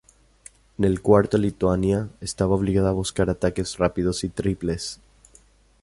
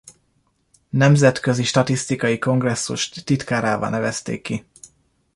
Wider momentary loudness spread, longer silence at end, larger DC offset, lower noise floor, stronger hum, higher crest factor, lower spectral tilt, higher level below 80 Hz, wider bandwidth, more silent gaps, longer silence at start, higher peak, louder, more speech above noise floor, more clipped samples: about the same, 11 LU vs 11 LU; about the same, 0.85 s vs 0.75 s; neither; second, -55 dBFS vs -65 dBFS; neither; about the same, 22 dB vs 18 dB; about the same, -6 dB/octave vs -5 dB/octave; first, -40 dBFS vs -54 dBFS; about the same, 11.5 kHz vs 11.5 kHz; neither; first, 0.8 s vs 0.05 s; about the same, -2 dBFS vs -2 dBFS; second, -23 LUFS vs -20 LUFS; second, 33 dB vs 46 dB; neither